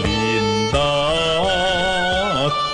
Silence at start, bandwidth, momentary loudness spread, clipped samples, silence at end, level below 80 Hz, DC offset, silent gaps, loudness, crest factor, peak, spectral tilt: 0 s; 10.5 kHz; 1 LU; under 0.1%; 0 s; -34 dBFS; under 0.1%; none; -18 LUFS; 12 dB; -8 dBFS; -4 dB/octave